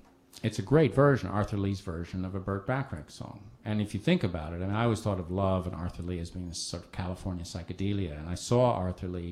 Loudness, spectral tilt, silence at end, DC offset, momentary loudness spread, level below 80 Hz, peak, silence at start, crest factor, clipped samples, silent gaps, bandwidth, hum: -31 LUFS; -6.5 dB/octave; 0 s; under 0.1%; 13 LU; -50 dBFS; -10 dBFS; 0.35 s; 20 dB; under 0.1%; none; 13 kHz; none